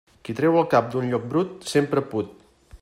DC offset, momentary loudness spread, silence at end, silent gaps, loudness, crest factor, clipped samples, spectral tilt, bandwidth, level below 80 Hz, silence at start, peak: under 0.1%; 10 LU; 0.05 s; none; -23 LUFS; 20 dB; under 0.1%; -6.5 dB/octave; 15.5 kHz; -58 dBFS; 0.25 s; -4 dBFS